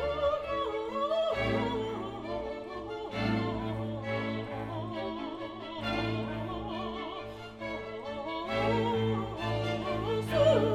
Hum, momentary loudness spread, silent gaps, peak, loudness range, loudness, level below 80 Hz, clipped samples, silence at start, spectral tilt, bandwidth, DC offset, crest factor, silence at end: none; 10 LU; none; -14 dBFS; 4 LU; -33 LUFS; -50 dBFS; under 0.1%; 0 s; -7 dB/octave; 13.5 kHz; under 0.1%; 20 dB; 0 s